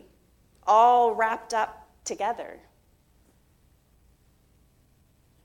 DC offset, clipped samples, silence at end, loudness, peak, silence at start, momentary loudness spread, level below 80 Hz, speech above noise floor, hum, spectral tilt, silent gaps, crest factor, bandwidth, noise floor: under 0.1%; under 0.1%; 2.9 s; -24 LUFS; -8 dBFS; 0.65 s; 18 LU; -64 dBFS; 39 dB; none; -2.5 dB/octave; none; 20 dB; 13.5 kHz; -62 dBFS